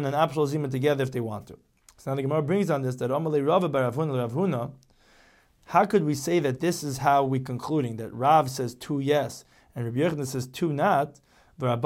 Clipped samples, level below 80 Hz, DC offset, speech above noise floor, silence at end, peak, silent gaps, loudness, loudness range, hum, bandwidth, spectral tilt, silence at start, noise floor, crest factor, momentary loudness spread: under 0.1%; -64 dBFS; under 0.1%; 34 dB; 0 s; -8 dBFS; none; -26 LUFS; 2 LU; none; 16.5 kHz; -6.5 dB/octave; 0 s; -59 dBFS; 18 dB; 10 LU